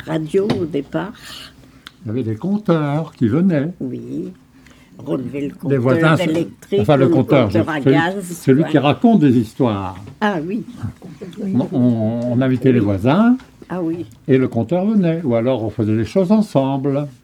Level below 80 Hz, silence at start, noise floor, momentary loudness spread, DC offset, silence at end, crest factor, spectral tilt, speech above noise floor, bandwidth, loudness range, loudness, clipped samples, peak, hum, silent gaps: -52 dBFS; 0 s; -46 dBFS; 14 LU; under 0.1%; 0.15 s; 18 dB; -8 dB/octave; 29 dB; 14 kHz; 5 LU; -17 LUFS; under 0.1%; 0 dBFS; none; none